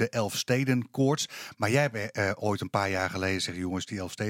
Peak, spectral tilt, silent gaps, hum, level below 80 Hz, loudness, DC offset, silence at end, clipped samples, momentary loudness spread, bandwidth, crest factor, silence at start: -10 dBFS; -5 dB/octave; none; none; -68 dBFS; -29 LUFS; under 0.1%; 0 s; under 0.1%; 7 LU; 17 kHz; 18 dB; 0 s